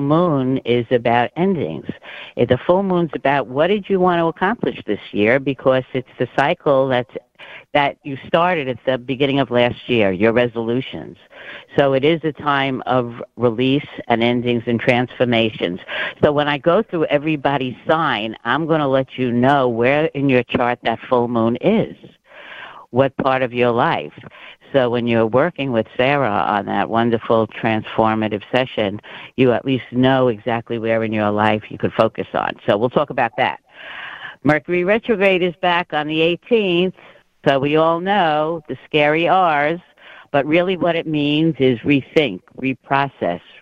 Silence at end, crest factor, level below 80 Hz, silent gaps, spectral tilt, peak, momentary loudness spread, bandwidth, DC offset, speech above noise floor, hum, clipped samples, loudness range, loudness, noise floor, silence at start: 0.25 s; 18 dB; -54 dBFS; none; -8 dB/octave; 0 dBFS; 8 LU; 7.4 kHz; under 0.1%; 20 dB; none; under 0.1%; 2 LU; -18 LUFS; -37 dBFS; 0 s